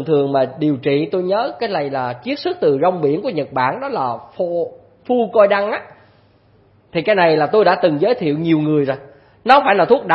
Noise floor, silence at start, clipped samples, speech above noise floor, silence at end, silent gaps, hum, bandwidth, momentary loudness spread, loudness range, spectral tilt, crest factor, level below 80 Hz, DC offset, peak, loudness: -52 dBFS; 0 s; under 0.1%; 36 dB; 0 s; none; none; 5.8 kHz; 10 LU; 4 LU; -8.5 dB/octave; 16 dB; -60 dBFS; under 0.1%; 0 dBFS; -17 LUFS